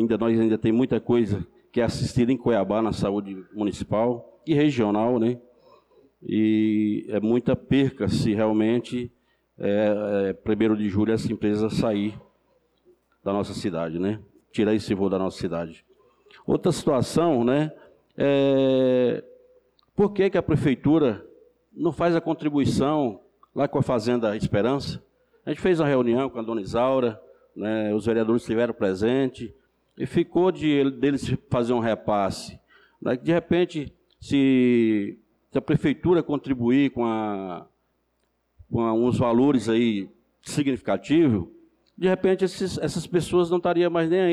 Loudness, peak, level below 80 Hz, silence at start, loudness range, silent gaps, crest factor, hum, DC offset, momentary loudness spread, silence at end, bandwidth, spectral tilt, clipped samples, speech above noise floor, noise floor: -24 LUFS; -12 dBFS; -52 dBFS; 0 s; 3 LU; none; 12 dB; none; under 0.1%; 10 LU; 0 s; 12.5 kHz; -7 dB/octave; under 0.1%; 49 dB; -72 dBFS